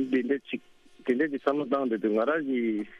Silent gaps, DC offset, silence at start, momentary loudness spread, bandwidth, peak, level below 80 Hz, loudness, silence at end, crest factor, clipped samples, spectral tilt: none; under 0.1%; 0 s; 9 LU; 6.8 kHz; -10 dBFS; -72 dBFS; -28 LUFS; 0 s; 18 dB; under 0.1%; -7 dB/octave